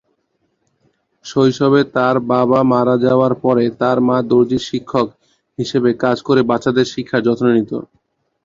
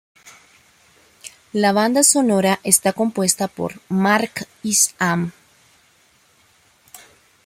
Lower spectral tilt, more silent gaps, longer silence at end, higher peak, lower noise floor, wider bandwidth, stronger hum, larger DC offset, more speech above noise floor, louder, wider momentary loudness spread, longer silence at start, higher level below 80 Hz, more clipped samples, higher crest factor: first, -7 dB/octave vs -3 dB/octave; neither; about the same, 0.6 s vs 0.5 s; about the same, 0 dBFS vs 0 dBFS; first, -66 dBFS vs -57 dBFS; second, 7.6 kHz vs 16.5 kHz; neither; neither; first, 52 dB vs 39 dB; first, -15 LUFS vs -18 LUFS; second, 8 LU vs 15 LU; first, 1.25 s vs 0.25 s; first, -54 dBFS vs -64 dBFS; neither; second, 16 dB vs 22 dB